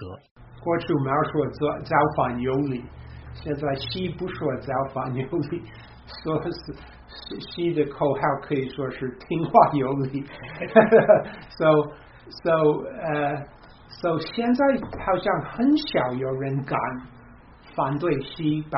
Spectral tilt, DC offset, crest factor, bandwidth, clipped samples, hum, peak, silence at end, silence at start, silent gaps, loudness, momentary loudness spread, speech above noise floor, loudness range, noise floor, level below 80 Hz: -5.5 dB/octave; under 0.1%; 24 dB; 5.8 kHz; under 0.1%; none; 0 dBFS; 0 s; 0 s; 0.31-0.36 s; -24 LUFS; 17 LU; 24 dB; 8 LU; -48 dBFS; -50 dBFS